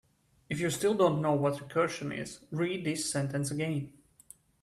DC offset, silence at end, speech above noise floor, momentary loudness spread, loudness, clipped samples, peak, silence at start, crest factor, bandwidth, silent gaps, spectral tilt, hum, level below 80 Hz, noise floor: under 0.1%; 0.75 s; 28 dB; 12 LU; -31 LUFS; under 0.1%; -12 dBFS; 0.5 s; 20 dB; 14.5 kHz; none; -5 dB/octave; none; -66 dBFS; -58 dBFS